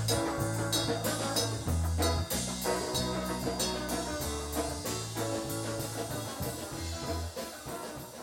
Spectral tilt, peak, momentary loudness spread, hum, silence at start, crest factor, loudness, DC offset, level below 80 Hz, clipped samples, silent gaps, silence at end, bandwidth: -4 dB/octave; -16 dBFS; 8 LU; none; 0 s; 18 dB; -33 LUFS; under 0.1%; -44 dBFS; under 0.1%; none; 0 s; 17 kHz